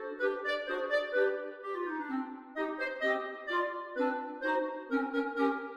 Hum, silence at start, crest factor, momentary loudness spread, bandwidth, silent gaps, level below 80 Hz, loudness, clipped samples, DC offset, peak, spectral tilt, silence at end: none; 0 s; 16 dB; 7 LU; 10 kHz; none; -76 dBFS; -34 LUFS; under 0.1%; under 0.1%; -18 dBFS; -4 dB/octave; 0 s